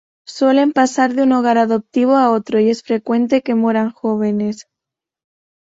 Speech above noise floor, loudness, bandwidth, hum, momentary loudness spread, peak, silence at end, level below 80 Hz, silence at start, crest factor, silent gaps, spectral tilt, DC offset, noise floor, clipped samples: 70 dB; -16 LUFS; 8 kHz; none; 7 LU; -2 dBFS; 1 s; -62 dBFS; 0.3 s; 14 dB; none; -5.5 dB/octave; under 0.1%; -84 dBFS; under 0.1%